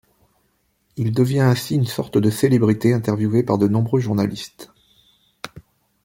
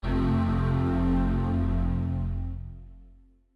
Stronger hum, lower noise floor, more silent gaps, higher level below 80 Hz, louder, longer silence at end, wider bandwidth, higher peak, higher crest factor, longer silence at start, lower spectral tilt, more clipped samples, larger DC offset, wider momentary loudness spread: neither; first, -66 dBFS vs -55 dBFS; neither; second, -56 dBFS vs -32 dBFS; first, -19 LUFS vs -27 LUFS; about the same, 0.45 s vs 0.5 s; first, 17 kHz vs 5.2 kHz; first, -2 dBFS vs -16 dBFS; first, 18 dB vs 10 dB; first, 0.95 s vs 0.05 s; second, -7 dB/octave vs -9.5 dB/octave; neither; neither; first, 20 LU vs 12 LU